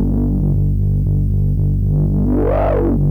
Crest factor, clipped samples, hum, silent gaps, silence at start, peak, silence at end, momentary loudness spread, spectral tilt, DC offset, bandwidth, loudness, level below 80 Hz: 6 dB; under 0.1%; 50 Hz at -20 dBFS; none; 0 s; -8 dBFS; 0 s; 1 LU; -12 dB/octave; 0.4%; 3.1 kHz; -17 LUFS; -20 dBFS